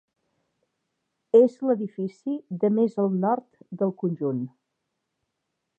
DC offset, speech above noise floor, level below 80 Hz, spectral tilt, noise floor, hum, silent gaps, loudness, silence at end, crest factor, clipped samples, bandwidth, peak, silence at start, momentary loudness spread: under 0.1%; 57 dB; -84 dBFS; -10.5 dB/octave; -80 dBFS; none; none; -25 LUFS; 1.3 s; 20 dB; under 0.1%; 7.6 kHz; -6 dBFS; 1.35 s; 13 LU